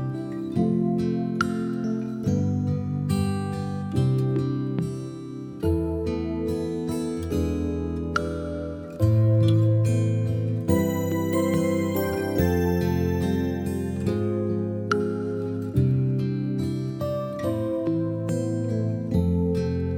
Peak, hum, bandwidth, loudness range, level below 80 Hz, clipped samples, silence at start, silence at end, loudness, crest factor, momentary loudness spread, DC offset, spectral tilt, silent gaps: -8 dBFS; none; 19 kHz; 4 LU; -42 dBFS; under 0.1%; 0 s; 0 s; -25 LUFS; 16 dB; 6 LU; under 0.1%; -8 dB/octave; none